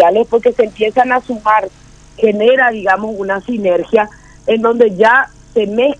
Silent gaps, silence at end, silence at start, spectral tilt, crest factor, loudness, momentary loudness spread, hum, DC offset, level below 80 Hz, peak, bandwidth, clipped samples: none; 0.05 s; 0 s; -5.5 dB/octave; 12 dB; -13 LUFS; 8 LU; none; under 0.1%; -46 dBFS; 0 dBFS; 8.8 kHz; 0.2%